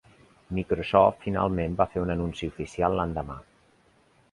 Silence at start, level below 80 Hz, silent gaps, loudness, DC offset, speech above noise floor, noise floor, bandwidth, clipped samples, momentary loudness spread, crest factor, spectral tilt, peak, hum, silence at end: 0.5 s; -44 dBFS; none; -27 LUFS; under 0.1%; 36 dB; -62 dBFS; 11 kHz; under 0.1%; 13 LU; 24 dB; -7.5 dB/octave; -4 dBFS; none; 0.9 s